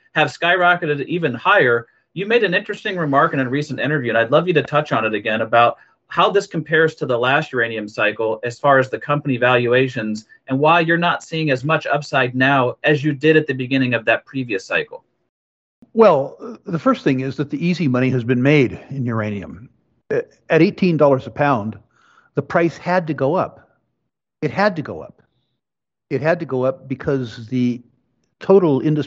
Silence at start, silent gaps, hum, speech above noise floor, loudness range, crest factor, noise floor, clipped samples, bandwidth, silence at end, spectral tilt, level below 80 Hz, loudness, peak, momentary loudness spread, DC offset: 0.15 s; 15.29-15.82 s; none; 70 dB; 6 LU; 18 dB; -88 dBFS; under 0.1%; 8.2 kHz; 0 s; -7 dB/octave; -60 dBFS; -18 LUFS; 0 dBFS; 11 LU; under 0.1%